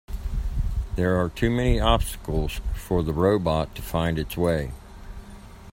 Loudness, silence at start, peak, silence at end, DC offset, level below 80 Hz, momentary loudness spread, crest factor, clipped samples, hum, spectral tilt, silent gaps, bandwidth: -25 LUFS; 0.1 s; -4 dBFS; 0 s; under 0.1%; -30 dBFS; 21 LU; 20 dB; under 0.1%; none; -6.5 dB/octave; none; 16 kHz